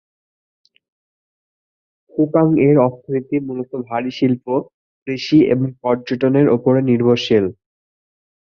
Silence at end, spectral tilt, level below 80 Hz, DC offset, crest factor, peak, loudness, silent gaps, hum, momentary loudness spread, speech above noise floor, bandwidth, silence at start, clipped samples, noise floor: 0.9 s; -8 dB/octave; -56 dBFS; under 0.1%; 16 dB; -2 dBFS; -17 LUFS; 4.74-5.06 s; none; 11 LU; over 74 dB; 6.8 kHz; 2.15 s; under 0.1%; under -90 dBFS